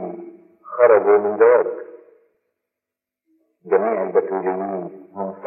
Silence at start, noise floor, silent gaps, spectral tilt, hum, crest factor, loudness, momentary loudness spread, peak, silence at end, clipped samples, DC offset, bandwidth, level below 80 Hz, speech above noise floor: 0 s; -86 dBFS; none; -12 dB/octave; none; 20 dB; -17 LUFS; 19 LU; 0 dBFS; 0 s; under 0.1%; under 0.1%; 2.9 kHz; -86 dBFS; 68 dB